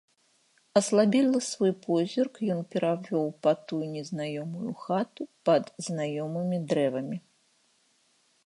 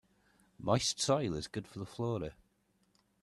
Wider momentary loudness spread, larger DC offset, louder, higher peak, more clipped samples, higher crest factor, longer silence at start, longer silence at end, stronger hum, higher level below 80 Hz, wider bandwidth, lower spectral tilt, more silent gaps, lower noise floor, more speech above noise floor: about the same, 11 LU vs 12 LU; neither; first, -28 LUFS vs -35 LUFS; first, -8 dBFS vs -14 dBFS; neither; about the same, 20 dB vs 22 dB; first, 0.75 s vs 0.6 s; first, 1.25 s vs 0.9 s; neither; second, -80 dBFS vs -62 dBFS; second, 11.5 kHz vs 13 kHz; about the same, -5.5 dB/octave vs -4.5 dB/octave; neither; second, -68 dBFS vs -75 dBFS; about the same, 40 dB vs 40 dB